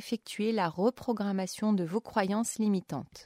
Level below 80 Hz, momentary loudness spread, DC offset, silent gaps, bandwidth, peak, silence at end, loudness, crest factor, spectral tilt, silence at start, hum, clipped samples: -68 dBFS; 4 LU; under 0.1%; none; 16 kHz; -14 dBFS; 0 s; -31 LUFS; 18 dB; -5.5 dB/octave; 0 s; none; under 0.1%